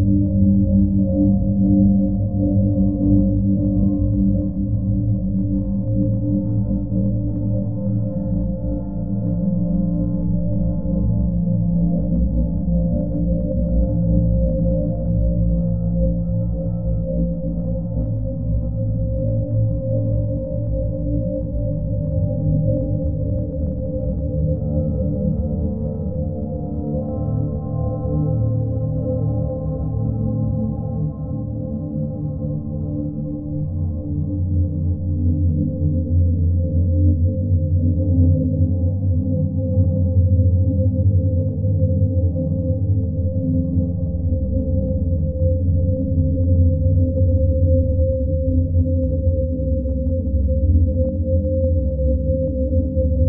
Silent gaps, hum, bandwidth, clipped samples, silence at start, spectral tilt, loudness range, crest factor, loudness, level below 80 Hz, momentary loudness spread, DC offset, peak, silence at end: none; none; 1.4 kHz; under 0.1%; 0 s; -18.5 dB/octave; 5 LU; 14 dB; -20 LUFS; -26 dBFS; 7 LU; 1%; -4 dBFS; 0 s